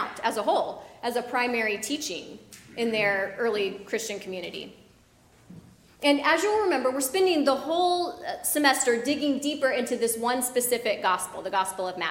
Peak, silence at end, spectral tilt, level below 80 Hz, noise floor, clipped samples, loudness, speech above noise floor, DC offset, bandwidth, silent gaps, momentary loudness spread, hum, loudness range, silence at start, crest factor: -6 dBFS; 0 s; -2 dB/octave; -66 dBFS; -58 dBFS; under 0.1%; -26 LUFS; 32 dB; under 0.1%; 16.5 kHz; none; 12 LU; none; 6 LU; 0 s; 22 dB